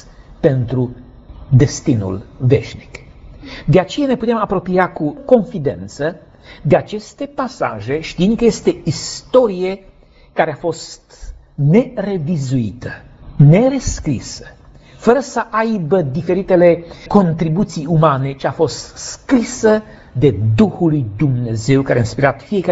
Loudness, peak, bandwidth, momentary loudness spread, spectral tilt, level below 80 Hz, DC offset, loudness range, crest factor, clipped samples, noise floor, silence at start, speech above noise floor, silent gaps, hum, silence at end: -16 LUFS; 0 dBFS; 8 kHz; 13 LU; -7 dB/octave; -38 dBFS; under 0.1%; 4 LU; 16 dB; under 0.1%; -36 dBFS; 0.05 s; 21 dB; none; none; 0 s